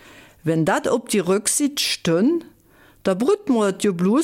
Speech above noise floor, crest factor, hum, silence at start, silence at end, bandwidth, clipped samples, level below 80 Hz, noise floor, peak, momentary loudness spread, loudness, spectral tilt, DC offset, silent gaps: 33 dB; 14 dB; none; 0.45 s; 0 s; 17 kHz; under 0.1%; -60 dBFS; -53 dBFS; -8 dBFS; 6 LU; -20 LUFS; -4.5 dB/octave; under 0.1%; none